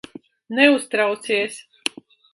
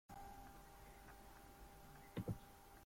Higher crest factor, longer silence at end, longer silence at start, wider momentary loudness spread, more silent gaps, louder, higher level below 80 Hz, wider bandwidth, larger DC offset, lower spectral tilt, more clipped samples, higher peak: about the same, 22 dB vs 22 dB; first, 0.75 s vs 0 s; first, 0.5 s vs 0.1 s; about the same, 13 LU vs 12 LU; neither; first, -20 LUFS vs -56 LUFS; second, -72 dBFS vs -64 dBFS; second, 11.5 kHz vs 16.5 kHz; neither; second, -2.5 dB/octave vs -6 dB/octave; neither; first, 0 dBFS vs -34 dBFS